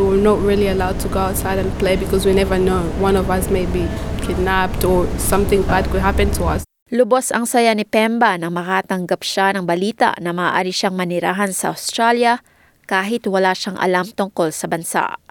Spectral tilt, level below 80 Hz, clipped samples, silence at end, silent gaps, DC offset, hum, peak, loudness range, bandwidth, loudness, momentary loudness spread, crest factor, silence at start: -5 dB/octave; -30 dBFS; under 0.1%; 0.15 s; 6.82-6.86 s; under 0.1%; none; -2 dBFS; 2 LU; 19 kHz; -18 LUFS; 6 LU; 16 dB; 0 s